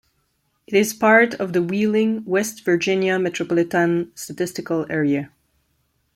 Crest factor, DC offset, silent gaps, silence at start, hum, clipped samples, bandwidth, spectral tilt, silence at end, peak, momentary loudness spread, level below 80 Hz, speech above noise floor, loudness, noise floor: 18 dB; under 0.1%; none; 0.7 s; none; under 0.1%; 16 kHz; -5 dB/octave; 0.9 s; -2 dBFS; 11 LU; -64 dBFS; 49 dB; -20 LUFS; -68 dBFS